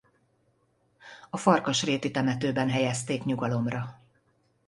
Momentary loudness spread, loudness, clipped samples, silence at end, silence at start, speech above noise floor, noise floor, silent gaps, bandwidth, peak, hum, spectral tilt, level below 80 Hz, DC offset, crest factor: 12 LU; -27 LUFS; under 0.1%; 0.75 s; 1.05 s; 43 dB; -69 dBFS; none; 11.5 kHz; -6 dBFS; none; -5 dB/octave; -64 dBFS; under 0.1%; 24 dB